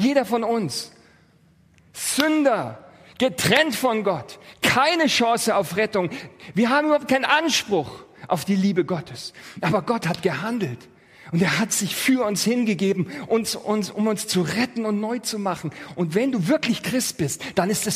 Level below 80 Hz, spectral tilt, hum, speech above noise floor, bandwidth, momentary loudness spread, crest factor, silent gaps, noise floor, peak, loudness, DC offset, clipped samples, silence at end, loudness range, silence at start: -60 dBFS; -4 dB/octave; none; 34 dB; 15.5 kHz; 11 LU; 20 dB; none; -57 dBFS; -2 dBFS; -22 LUFS; under 0.1%; under 0.1%; 0 s; 4 LU; 0 s